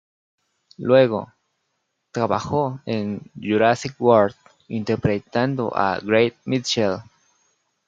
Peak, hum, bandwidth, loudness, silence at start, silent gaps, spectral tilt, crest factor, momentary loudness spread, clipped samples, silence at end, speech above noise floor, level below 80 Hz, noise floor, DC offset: -2 dBFS; none; 7.8 kHz; -21 LUFS; 0.8 s; none; -6 dB/octave; 20 dB; 13 LU; under 0.1%; 0.85 s; 54 dB; -60 dBFS; -74 dBFS; under 0.1%